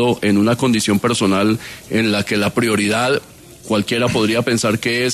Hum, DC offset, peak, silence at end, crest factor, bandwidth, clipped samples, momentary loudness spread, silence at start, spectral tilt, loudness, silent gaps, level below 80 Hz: none; under 0.1%; -4 dBFS; 0 s; 12 dB; 13.5 kHz; under 0.1%; 4 LU; 0 s; -4.5 dB/octave; -17 LUFS; none; -50 dBFS